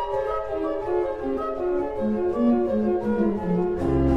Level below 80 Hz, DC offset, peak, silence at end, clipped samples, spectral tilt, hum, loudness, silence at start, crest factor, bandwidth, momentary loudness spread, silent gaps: -38 dBFS; under 0.1%; -8 dBFS; 0 s; under 0.1%; -9.5 dB/octave; none; -25 LUFS; 0 s; 14 dB; 6.4 kHz; 6 LU; none